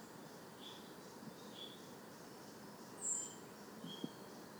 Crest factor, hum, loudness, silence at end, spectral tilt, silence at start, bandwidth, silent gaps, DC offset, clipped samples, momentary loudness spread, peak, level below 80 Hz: 22 dB; none; -49 LUFS; 0 s; -2.5 dB/octave; 0 s; over 20 kHz; none; under 0.1%; under 0.1%; 14 LU; -30 dBFS; -86 dBFS